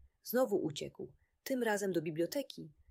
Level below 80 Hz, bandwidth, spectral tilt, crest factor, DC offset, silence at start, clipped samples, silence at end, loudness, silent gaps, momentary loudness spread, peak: -74 dBFS; 16 kHz; -5 dB/octave; 16 dB; under 0.1%; 0.25 s; under 0.1%; 0.2 s; -36 LUFS; none; 17 LU; -22 dBFS